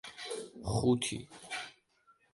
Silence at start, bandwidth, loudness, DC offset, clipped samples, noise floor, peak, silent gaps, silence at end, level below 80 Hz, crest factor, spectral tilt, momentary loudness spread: 0.05 s; 11.5 kHz; -35 LUFS; under 0.1%; under 0.1%; -69 dBFS; -18 dBFS; none; 0.6 s; -56 dBFS; 18 dB; -5 dB/octave; 13 LU